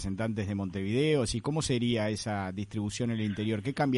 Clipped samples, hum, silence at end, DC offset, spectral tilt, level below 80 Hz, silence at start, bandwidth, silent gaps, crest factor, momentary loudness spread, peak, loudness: under 0.1%; none; 0 s; under 0.1%; -5.5 dB/octave; -52 dBFS; 0 s; 11.5 kHz; none; 14 dB; 7 LU; -16 dBFS; -31 LUFS